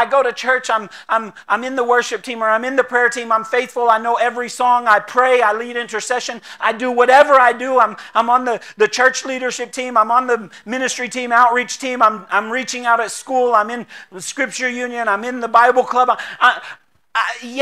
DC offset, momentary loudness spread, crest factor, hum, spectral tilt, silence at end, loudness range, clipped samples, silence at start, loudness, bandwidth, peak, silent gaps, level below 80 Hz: 0.1%; 9 LU; 16 dB; none; -2 dB/octave; 0 s; 3 LU; under 0.1%; 0 s; -16 LUFS; 14 kHz; 0 dBFS; none; -72 dBFS